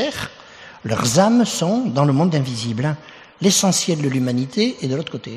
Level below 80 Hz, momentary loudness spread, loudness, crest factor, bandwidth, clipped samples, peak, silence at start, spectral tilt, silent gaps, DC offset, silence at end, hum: -56 dBFS; 10 LU; -19 LUFS; 18 dB; 14 kHz; under 0.1%; -2 dBFS; 0 s; -4.5 dB/octave; none; under 0.1%; 0 s; none